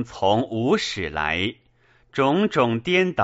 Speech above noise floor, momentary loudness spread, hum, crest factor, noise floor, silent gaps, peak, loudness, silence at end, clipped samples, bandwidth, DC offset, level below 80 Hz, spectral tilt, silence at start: 37 dB; 6 LU; none; 16 dB; -59 dBFS; none; -6 dBFS; -22 LUFS; 0 s; under 0.1%; 8 kHz; under 0.1%; -50 dBFS; -3.5 dB/octave; 0 s